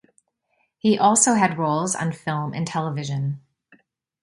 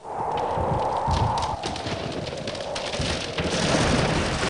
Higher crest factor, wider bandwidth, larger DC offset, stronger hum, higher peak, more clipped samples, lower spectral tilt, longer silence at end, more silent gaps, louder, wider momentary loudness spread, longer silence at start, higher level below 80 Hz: first, 22 dB vs 16 dB; about the same, 11.5 kHz vs 10.5 kHz; neither; neither; first, -2 dBFS vs -10 dBFS; neither; about the same, -4.5 dB/octave vs -4.5 dB/octave; first, 0.85 s vs 0 s; neither; first, -21 LUFS vs -25 LUFS; first, 11 LU vs 8 LU; first, 0.85 s vs 0 s; second, -64 dBFS vs -38 dBFS